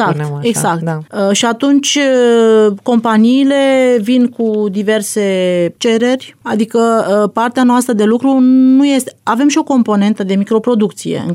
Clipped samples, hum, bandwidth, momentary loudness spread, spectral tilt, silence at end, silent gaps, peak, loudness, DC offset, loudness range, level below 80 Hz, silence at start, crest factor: under 0.1%; none; 15.5 kHz; 7 LU; -5 dB/octave; 0 s; none; -2 dBFS; -12 LUFS; under 0.1%; 3 LU; -66 dBFS; 0 s; 8 dB